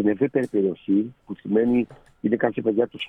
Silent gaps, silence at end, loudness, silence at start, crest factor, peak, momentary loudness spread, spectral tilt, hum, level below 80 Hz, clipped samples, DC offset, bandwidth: none; 0 s; -24 LUFS; 0 s; 16 dB; -6 dBFS; 10 LU; -8.5 dB/octave; none; -60 dBFS; under 0.1%; under 0.1%; 9.4 kHz